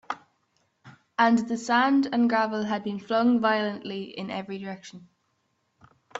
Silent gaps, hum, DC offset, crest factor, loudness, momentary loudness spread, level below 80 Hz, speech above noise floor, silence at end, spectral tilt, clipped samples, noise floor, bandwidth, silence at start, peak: none; none; under 0.1%; 20 dB; -25 LUFS; 16 LU; -72 dBFS; 48 dB; 0 s; -5 dB/octave; under 0.1%; -73 dBFS; 7.8 kHz; 0.1 s; -6 dBFS